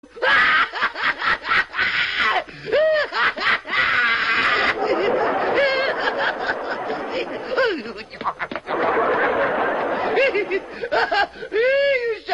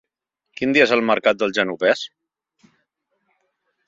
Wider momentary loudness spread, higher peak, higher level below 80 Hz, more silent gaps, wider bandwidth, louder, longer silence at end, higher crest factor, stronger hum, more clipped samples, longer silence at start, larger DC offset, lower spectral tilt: about the same, 9 LU vs 9 LU; second, -6 dBFS vs -2 dBFS; first, -54 dBFS vs -66 dBFS; neither; first, 10.5 kHz vs 7.8 kHz; about the same, -20 LUFS vs -18 LUFS; second, 0 s vs 1.8 s; second, 14 dB vs 20 dB; neither; neither; second, 0.15 s vs 0.6 s; neither; about the same, -3.5 dB/octave vs -4.5 dB/octave